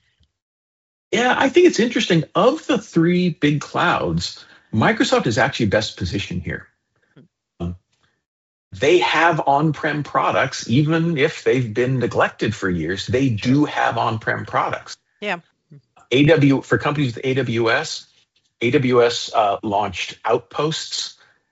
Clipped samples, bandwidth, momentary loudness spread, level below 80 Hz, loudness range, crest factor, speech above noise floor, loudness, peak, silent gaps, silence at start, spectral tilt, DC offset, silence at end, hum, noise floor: under 0.1%; 8 kHz; 11 LU; -54 dBFS; 4 LU; 18 dB; 47 dB; -19 LUFS; -2 dBFS; 8.26-8.71 s; 1.1 s; -4.5 dB/octave; under 0.1%; 0.4 s; none; -66 dBFS